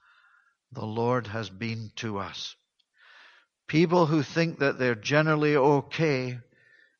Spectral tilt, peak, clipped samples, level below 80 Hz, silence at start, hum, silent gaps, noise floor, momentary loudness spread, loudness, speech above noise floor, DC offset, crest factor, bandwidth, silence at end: -6.5 dB/octave; -6 dBFS; under 0.1%; -68 dBFS; 0.7 s; none; none; -64 dBFS; 14 LU; -26 LUFS; 38 dB; under 0.1%; 22 dB; 7.2 kHz; 0.55 s